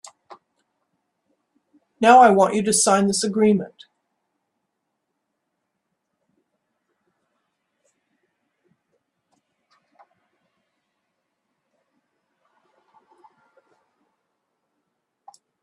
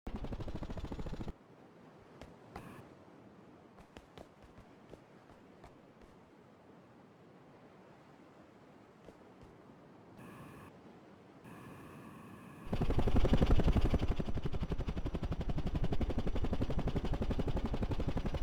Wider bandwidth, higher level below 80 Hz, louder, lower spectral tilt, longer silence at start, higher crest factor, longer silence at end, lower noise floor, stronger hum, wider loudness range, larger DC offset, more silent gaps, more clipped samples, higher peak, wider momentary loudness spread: first, 12 kHz vs 7.8 kHz; second, -68 dBFS vs -40 dBFS; first, -16 LUFS vs -38 LUFS; second, -4 dB/octave vs -8 dB/octave; first, 2 s vs 0.05 s; about the same, 24 dB vs 20 dB; first, 11.95 s vs 0 s; first, -78 dBFS vs -60 dBFS; neither; second, 9 LU vs 23 LU; neither; neither; neither; first, 0 dBFS vs -16 dBFS; second, 9 LU vs 25 LU